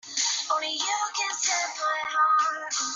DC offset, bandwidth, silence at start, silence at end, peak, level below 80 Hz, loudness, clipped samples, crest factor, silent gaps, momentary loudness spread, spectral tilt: under 0.1%; 7.8 kHz; 0.05 s; 0 s; -12 dBFS; -80 dBFS; -25 LUFS; under 0.1%; 16 dB; none; 5 LU; 3 dB/octave